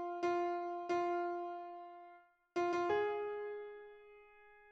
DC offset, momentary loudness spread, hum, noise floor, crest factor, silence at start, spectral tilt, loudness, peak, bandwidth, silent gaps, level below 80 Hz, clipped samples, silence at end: under 0.1%; 19 LU; none; -63 dBFS; 14 dB; 0 s; -5 dB/octave; -39 LUFS; -26 dBFS; 7.6 kHz; none; -80 dBFS; under 0.1%; 0 s